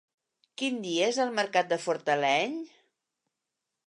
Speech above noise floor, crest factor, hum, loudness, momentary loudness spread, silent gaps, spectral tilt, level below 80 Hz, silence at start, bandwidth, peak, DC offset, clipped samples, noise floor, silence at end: 58 dB; 18 dB; none; -28 LUFS; 12 LU; none; -3 dB/octave; -86 dBFS; 0.6 s; 11 kHz; -12 dBFS; under 0.1%; under 0.1%; -86 dBFS; 1.2 s